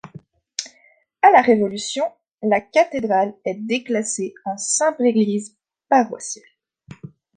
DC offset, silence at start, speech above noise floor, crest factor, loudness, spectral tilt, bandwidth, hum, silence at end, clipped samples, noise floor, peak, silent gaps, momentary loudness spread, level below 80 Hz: under 0.1%; 0.6 s; 38 dB; 18 dB; -19 LUFS; -3.5 dB/octave; 10 kHz; none; 0.3 s; under 0.1%; -57 dBFS; -2 dBFS; 2.34-2.38 s; 16 LU; -66 dBFS